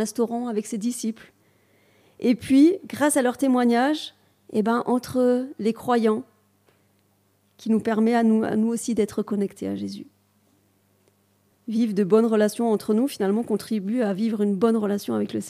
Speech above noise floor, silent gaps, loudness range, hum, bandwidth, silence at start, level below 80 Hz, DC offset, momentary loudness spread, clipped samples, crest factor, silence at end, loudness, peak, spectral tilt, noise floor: 43 dB; none; 4 LU; 50 Hz at -55 dBFS; 15.5 kHz; 0 s; -68 dBFS; under 0.1%; 10 LU; under 0.1%; 16 dB; 0 s; -23 LUFS; -8 dBFS; -5.5 dB/octave; -65 dBFS